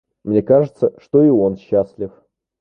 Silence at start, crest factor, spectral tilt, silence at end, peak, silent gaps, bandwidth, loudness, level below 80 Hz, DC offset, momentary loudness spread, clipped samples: 0.25 s; 14 dB; -11 dB/octave; 0.5 s; -2 dBFS; none; 5.8 kHz; -16 LUFS; -52 dBFS; under 0.1%; 13 LU; under 0.1%